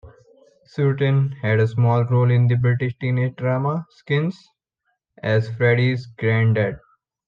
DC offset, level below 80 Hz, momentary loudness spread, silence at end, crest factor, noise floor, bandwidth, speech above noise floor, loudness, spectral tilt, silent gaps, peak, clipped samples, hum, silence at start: under 0.1%; -58 dBFS; 8 LU; 0.5 s; 14 dB; -74 dBFS; 5.4 kHz; 55 dB; -20 LUFS; -9 dB/octave; none; -6 dBFS; under 0.1%; none; 0.05 s